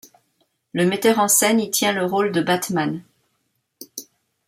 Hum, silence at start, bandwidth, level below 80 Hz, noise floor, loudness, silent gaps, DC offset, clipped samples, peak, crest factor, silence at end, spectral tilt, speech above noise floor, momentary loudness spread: none; 0.75 s; 16.5 kHz; -66 dBFS; -71 dBFS; -19 LUFS; none; under 0.1%; under 0.1%; -2 dBFS; 20 dB; 0.45 s; -3.5 dB/octave; 52 dB; 21 LU